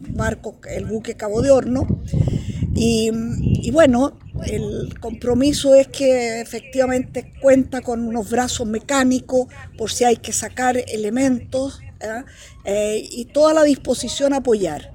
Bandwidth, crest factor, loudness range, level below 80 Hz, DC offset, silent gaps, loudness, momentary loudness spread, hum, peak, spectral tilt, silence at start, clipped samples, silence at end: 17 kHz; 18 dB; 3 LU; -36 dBFS; under 0.1%; none; -19 LUFS; 14 LU; none; -2 dBFS; -5 dB/octave; 0 s; under 0.1%; 0.05 s